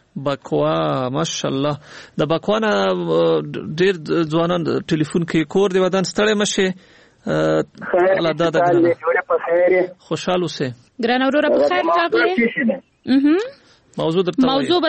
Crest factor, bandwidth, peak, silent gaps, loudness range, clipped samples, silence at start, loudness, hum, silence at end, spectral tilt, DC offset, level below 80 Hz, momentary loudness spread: 14 dB; 8.8 kHz; -4 dBFS; none; 2 LU; under 0.1%; 0.15 s; -18 LUFS; none; 0 s; -5.5 dB/octave; under 0.1%; -56 dBFS; 8 LU